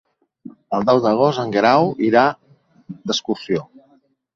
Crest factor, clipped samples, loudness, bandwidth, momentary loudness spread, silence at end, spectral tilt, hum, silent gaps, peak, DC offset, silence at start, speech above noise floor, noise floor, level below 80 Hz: 18 dB; under 0.1%; -18 LUFS; 7.6 kHz; 11 LU; 0.7 s; -5.5 dB/octave; none; none; -2 dBFS; under 0.1%; 0.7 s; 41 dB; -58 dBFS; -60 dBFS